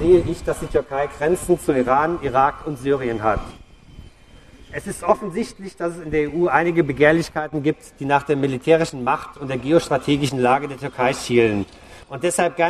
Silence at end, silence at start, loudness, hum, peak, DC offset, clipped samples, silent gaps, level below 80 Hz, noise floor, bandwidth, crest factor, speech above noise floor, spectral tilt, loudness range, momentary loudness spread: 0 s; 0 s; -20 LUFS; none; 0 dBFS; under 0.1%; under 0.1%; none; -42 dBFS; -47 dBFS; 13.5 kHz; 20 dB; 27 dB; -5.5 dB/octave; 6 LU; 11 LU